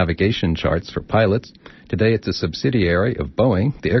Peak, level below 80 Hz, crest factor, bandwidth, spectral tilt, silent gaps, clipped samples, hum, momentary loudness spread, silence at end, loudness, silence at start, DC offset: -4 dBFS; -38 dBFS; 14 dB; 6.2 kHz; -5.5 dB/octave; none; under 0.1%; none; 5 LU; 0 s; -20 LUFS; 0 s; under 0.1%